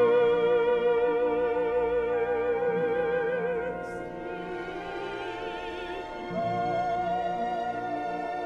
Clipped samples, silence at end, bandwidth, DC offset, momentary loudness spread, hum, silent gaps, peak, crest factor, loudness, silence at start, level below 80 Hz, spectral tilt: under 0.1%; 0 s; 7 kHz; under 0.1%; 11 LU; 60 Hz at -65 dBFS; none; -14 dBFS; 14 dB; -29 LUFS; 0 s; -54 dBFS; -6.5 dB/octave